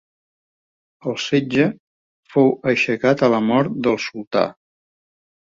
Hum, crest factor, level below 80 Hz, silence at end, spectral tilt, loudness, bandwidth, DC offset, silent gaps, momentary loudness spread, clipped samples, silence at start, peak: none; 18 dB; -62 dBFS; 1 s; -6 dB/octave; -19 LUFS; 7.6 kHz; under 0.1%; 1.79-2.23 s, 4.27-4.31 s; 9 LU; under 0.1%; 1.05 s; -2 dBFS